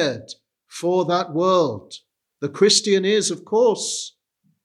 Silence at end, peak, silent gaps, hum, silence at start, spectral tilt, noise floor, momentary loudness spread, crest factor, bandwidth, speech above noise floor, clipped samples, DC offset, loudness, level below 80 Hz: 0.55 s; -4 dBFS; none; none; 0 s; -3.5 dB/octave; -68 dBFS; 20 LU; 18 dB; 12.5 kHz; 48 dB; under 0.1%; under 0.1%; -19 LUFS; -78 dBFS